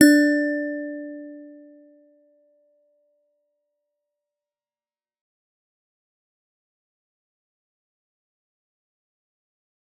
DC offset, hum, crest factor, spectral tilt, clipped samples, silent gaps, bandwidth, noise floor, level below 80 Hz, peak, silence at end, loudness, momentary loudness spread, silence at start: under 0.1%; none; 28 dB; -3 dB/octave; under 0.1%; none; 14 kHz; under -90 dBFS; -82 dBFS; 0 dBFS; 8.5 s; -22 LUFS; 25 LU; 0 s